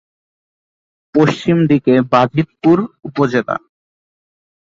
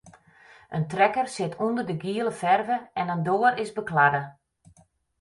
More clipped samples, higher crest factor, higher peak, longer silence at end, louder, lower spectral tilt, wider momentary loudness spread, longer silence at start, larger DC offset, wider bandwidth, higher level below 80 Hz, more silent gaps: neither; about the same, 16 dB vs 20 dB; first, -2 dBFS vs -6 dBFS; first, 1.15 s vs 0.9 s; first, -15 LUFS vs -25 LUFS; first, -7.5 dB/octave vs -6 dB/octave; about the same, 8 LU vs 9 LU; first, 1.15 s vs 0.05 s; neither; second, 7.6 kHz vs 11.5 kHz; first, -54 dBFS vs -66 dBFS; neither